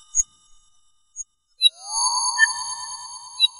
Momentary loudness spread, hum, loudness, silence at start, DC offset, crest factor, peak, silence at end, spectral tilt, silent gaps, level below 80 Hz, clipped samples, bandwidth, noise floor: 18 LU; none; -20 LUFS; 0.15 s; under 0.1%; 20 dB; -4 dBFS; 0 s; 6 dB/octave; none; -56 dBFS; under 0.1%; 11 kHz; -63 dBFS